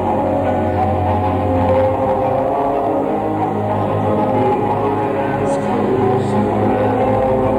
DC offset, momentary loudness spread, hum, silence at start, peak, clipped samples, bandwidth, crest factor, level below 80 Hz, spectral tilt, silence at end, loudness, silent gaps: under 0.1%; 3 LU; none; 0 s; -4 dBFS; under 0.1%; 11.5 kHz; 12 dB; -40 dBFS; -8.5 dB/octave; 0 s; -16 LUFS; none